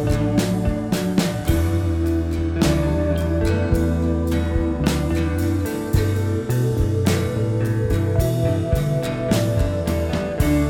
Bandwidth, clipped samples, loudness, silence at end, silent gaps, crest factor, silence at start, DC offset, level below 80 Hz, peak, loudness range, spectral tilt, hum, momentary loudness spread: 18 kHz; under 0.1%; -21 LUFS; 0 s; none; 14 dB; 0 s; under 0.1%; -30 dBFS; -6 dBFS; 1 LU; -7 dB/octave; none; 3 LU